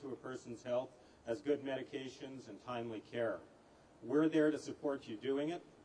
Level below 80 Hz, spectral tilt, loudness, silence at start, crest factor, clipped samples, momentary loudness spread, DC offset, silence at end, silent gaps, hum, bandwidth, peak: -78 dBFS; -6 dB/octave; -40 LUFS; 0 s; 18 dB; under 0.1%; 16 LU; under 0.1%; 0 s; none; none; 10 kHz; -22 dBFS